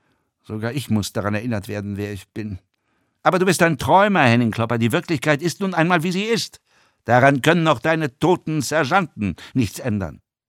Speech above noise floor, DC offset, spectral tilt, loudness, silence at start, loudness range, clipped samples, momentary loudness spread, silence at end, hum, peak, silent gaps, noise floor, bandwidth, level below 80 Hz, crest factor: 49 dB; under 0.1%; -5.5 dB/octave; -19 LUFS; 0.5 s; 5 LU; under 0.1%; 14 LU; 0.3 s; none; -2 dBFS; none; -68 dBFS; 17 kHz; -54 dBFS; 18 dB